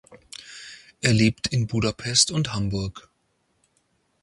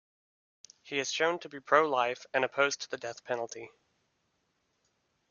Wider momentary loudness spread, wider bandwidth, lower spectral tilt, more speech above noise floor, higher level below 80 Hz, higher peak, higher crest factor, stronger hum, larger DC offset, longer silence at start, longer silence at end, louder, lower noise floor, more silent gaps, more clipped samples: first, 21 LU vs 13 LU; first, 11.5 kHz vs 7.4 kHz; first, -4 dB/octave vs -2.5 dB/octave; about the same, 47 dB vs 46 dB; first, -48 dBFS vs -82 dBFS; first, -4 dBFS vs -8 dBFS; about the same, 22 dB vs 26 dB; neither; neither; second, 0.1 s vs 0.85 s; second, 1.2 s vs 1.65 s; first, -23 LUFS vs -31 LUFS; second, -70 dBFS vs -77 dBFS; neither; neither